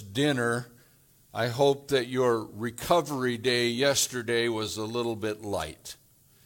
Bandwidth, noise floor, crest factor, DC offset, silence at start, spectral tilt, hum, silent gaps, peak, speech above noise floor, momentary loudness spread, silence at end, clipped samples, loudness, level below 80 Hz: 18.5 kHz; -60 dBFS; 20 dB; under 0.1%; 0 s; -4 dB/octave; none; none; -8 dBFS; 33 dB; 12 LU; 0.5 s; under 0.1%; -28 LUFS; -60 dBFS